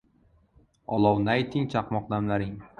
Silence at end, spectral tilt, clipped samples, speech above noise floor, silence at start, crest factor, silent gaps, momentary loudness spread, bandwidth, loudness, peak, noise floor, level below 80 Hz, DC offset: 0.15 s; -8 dB/octave; under 0.1%; 37 dB; 0.9 s; 20 dB; none; 8 LU; 9 kHz; -27 LUFS; -8 dBFS; -63 dBFS; -54 dBFS; under 0.1%